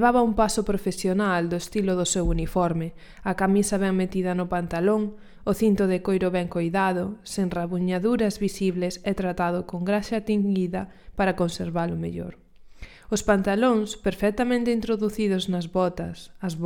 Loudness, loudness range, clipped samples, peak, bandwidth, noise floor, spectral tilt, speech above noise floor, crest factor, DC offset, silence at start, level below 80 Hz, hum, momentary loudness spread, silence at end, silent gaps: -25 LUFS; 2 LU; under 0.1%; -6 dBFS; 17.5 kHz; -44 dBFS; -5.5 dB/octave; 19 dB; 18 dB; under 0.1%; 0 s; -42 dBFS; none; 9 LU; 0 s; none